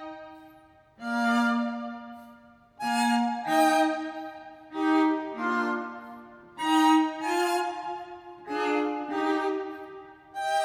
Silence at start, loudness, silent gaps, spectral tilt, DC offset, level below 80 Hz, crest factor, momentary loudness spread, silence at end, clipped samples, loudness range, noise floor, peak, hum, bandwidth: 0 s; -27 LUFS; none; -3.5 dB/octave; under 0.1%; -74 dBFS; 18 dB; 21 LU; 0 s; under 0.1%; 3 LU; -56 dBFS; -10 dBFS; none; 18.5 kHz